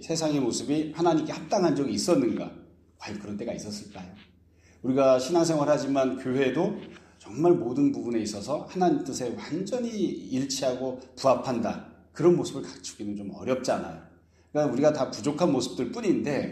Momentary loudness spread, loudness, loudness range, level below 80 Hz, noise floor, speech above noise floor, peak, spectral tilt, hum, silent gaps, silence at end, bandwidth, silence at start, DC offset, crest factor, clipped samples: 15 LU; -27 LUFS; 4 LU; -64 dBFS; -58 dBFS; 32 dB; -8 dBFS; -5.5 dB/octave; none; none; 0 s; 13 kHz; 0 s; under 0.1%; 18 dB; under 0.1%